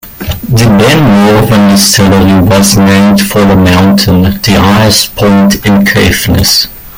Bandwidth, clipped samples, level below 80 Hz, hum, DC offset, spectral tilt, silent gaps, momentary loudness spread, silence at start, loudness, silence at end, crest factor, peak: 17.5 kHz; 0.5%; -26 dBFS; none; under 0.1%; -4.5 dB/octave; none; 3 LU; 0.05 s; -5 LUFS; 0 s; 6 dB; 0 dBFS